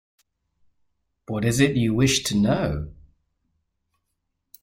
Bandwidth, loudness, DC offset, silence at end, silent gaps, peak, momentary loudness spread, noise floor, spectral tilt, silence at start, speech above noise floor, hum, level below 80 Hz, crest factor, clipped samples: 16 kHz; -22 LUFS; under 0.1%; 1.75 s; none; -4 dBFS; 12 LU; -77 dBFS; -5 dB/octave; 1.3 s; 56 dB; none; -46 dBFS; 22 dB; under 0.1%